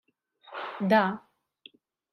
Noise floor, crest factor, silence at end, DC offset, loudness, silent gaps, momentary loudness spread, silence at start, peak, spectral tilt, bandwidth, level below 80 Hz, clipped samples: -57 dBFS; 20 dB; 0.95 s; under 0.1%; -27 LUFS; none; 18 LU; 0.5 s; -10 dBFS; -7.5 dB/octave; 12.5 kHz; -80 dBFS; under 0.1%